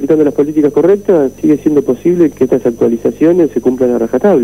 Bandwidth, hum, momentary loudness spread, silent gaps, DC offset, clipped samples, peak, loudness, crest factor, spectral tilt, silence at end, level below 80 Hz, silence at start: 15.5 kHz; none; 3 LU; none; 0.5%; under 0.1%; 0 dBFS; -11 LUFS; 10 dB; -8 dB/octave; 0 s; -46 dBFS; 0 s